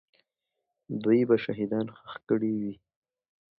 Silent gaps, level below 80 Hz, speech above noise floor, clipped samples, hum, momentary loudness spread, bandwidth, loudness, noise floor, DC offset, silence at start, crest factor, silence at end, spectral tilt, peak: none; -70 dBFS; 57 dB; under 0.1%; none; 14 LU; 5.4 kHz; -28 LUFS; -84 dBFS; under 0.1%; 0.9 s; 20 dB; 0.85 s; -10.5 dB/octave; -10 dBFS